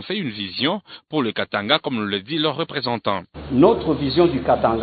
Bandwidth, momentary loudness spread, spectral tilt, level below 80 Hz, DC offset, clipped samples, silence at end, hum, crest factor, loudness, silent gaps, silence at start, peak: 4.8 kHz; 9 LU; -10.5 dB/octave; -46 dBFS; under 0.1%; under 0.1%; 0 s; none; 20 dB; -21 LUFS; none; 0 s; 0 dBFS